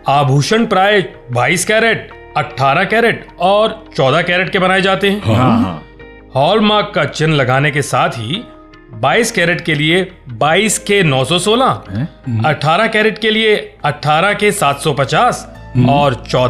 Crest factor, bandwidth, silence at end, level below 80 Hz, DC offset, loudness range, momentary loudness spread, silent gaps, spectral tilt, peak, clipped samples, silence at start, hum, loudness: 12 dB; 15.5 kHz; 0 s; -42 dBFS; under 0.1%; 2 LU; 9 LU; none; -4.5 dB/octave; -2 dBFS; under 0.1%; 0.05 s; none; -13 LUFS